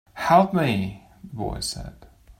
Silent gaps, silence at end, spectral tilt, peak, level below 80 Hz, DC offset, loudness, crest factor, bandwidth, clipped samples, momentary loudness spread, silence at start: none; 0.1 s; -5.5 dB/octave; -4 dBFS; -44 dBFS; under 0.1%; -23 LUFS; 20 dB; 16.5 kHz; under 0.1%; 23 LU; 0.15 s